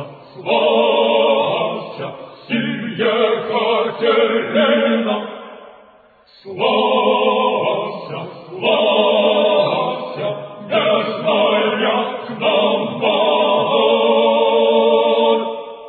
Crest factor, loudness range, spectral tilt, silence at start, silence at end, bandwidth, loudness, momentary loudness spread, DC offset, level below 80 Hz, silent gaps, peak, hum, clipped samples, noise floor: 14 dB; 3 LU; -8 dB/octave; 0 s; 0 s; 4.7 kHz; -16 LUFS; 13 LU; under 0.1%; -70 dBFS; none; -2 dBFS; none; under 0.1%; -49 dBFS